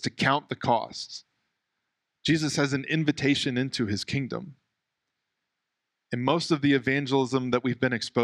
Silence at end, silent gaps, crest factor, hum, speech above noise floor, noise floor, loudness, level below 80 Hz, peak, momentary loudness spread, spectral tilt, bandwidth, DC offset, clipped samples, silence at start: 0 s; none; 20 dB; none; 57 dB; -83 dBFS; -26 LUFS; -62 dBFS; -8 dBFS; 11 LU; -5 dB/octave; 12 kHz; under 0.1%; under 0.1%; 0 s